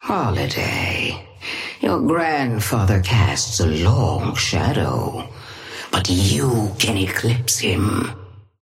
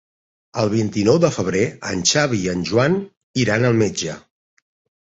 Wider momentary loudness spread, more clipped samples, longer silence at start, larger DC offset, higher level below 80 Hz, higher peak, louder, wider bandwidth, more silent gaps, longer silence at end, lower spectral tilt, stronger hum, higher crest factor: about the same, 11 LU vs 10 LU; neither; second, 0 s vs 0.55 s; neither; first, -40 dBFS vs -50 dBFS; about the same, -4 dBFS vs -2 dBFS; about the same, -19 LUFS vs -19 LUFS; first, 16 kHz vs 8.2 kHz; second, none vs 3.17-3.34 s; second, 0.2 s vs 0.9 s; about the same, -4.5 dB/octave vs -4.5 dB/octave; neither; about the same, 16 dB vs 18 dB